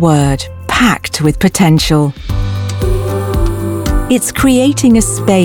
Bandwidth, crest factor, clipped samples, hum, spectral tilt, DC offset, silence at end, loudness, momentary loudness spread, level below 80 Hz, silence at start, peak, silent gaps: 18.5 kHz; 10 dB; under 0.1%; none; -5 dB/octave; under 0.1%; 0 s; -12 LUFS; 8 LU; -22 dBFS; 0 s; 0 dBFS; none